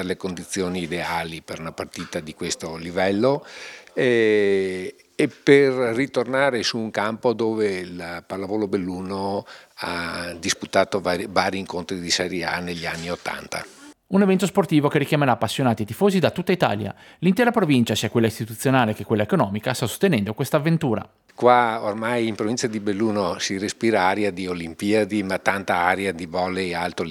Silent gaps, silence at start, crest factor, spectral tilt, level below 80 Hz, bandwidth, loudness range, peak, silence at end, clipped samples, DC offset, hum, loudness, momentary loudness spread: none; 0 s; 22 dB; -5 dB/octave; -62 dBFS; 18.5 kHz; 5 LU; 0 dBFS; 0 s; under 0.1%; under 0.1%; none; -22 LUFS; 11 LU